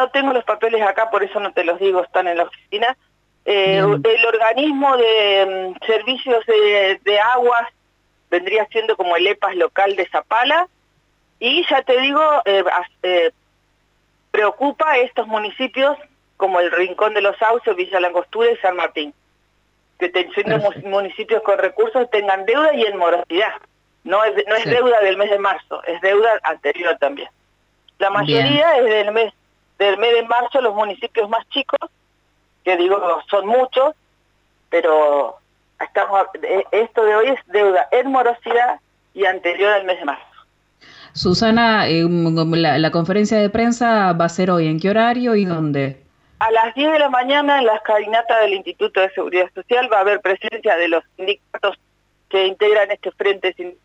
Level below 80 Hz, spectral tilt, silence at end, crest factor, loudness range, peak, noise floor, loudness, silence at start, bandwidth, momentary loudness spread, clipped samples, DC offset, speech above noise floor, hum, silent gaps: -58 dBFS; -5.5 dB/octave; 0.15 s; 12 dB; 4 LU; -4 dBFS; -62 dBFS; -17 LUFS; 0 s; 8.2 kHz; 8 LU; under 0.1%; under 0.1%; 46 dB; 50 Hz at -60 dBFS; none